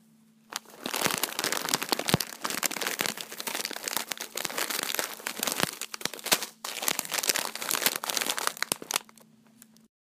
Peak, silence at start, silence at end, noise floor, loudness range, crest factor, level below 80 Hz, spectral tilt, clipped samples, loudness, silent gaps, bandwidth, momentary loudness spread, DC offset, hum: -4 dBFS; 0.5 s; 0.95 s; -60 dBFS; 3 LU; 28 dB; -66 dBFS; -1 dB/octave; under 0.1%; -29 LUFS; none; 16 kHz; 7 LU; under 0.1%; none